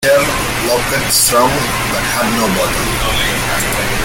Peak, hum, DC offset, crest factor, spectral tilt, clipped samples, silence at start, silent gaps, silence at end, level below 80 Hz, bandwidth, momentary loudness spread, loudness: 0 dBFS; none; under 0.1%; 14 dB; -2.5 dB/octave; under 0.1%; 0 s; none; 0 s; -28 dBFS; 17 kHz; 5 LU; -13 LUFS